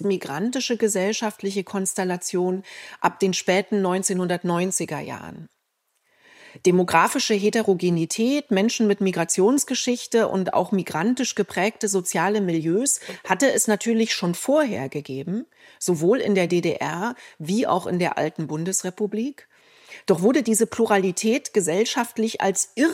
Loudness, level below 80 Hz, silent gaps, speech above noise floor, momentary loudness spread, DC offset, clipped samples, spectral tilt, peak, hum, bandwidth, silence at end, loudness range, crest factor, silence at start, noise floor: -22 LUFS; -72 dBFS; none; 51 dB; 9 LU; under 0.1%; under 0.1%; -4 dB/octave; -4 dBFS; none; 16 kHz; 0 s; 4 LU; 20 dB; 0 s; -73 dBFS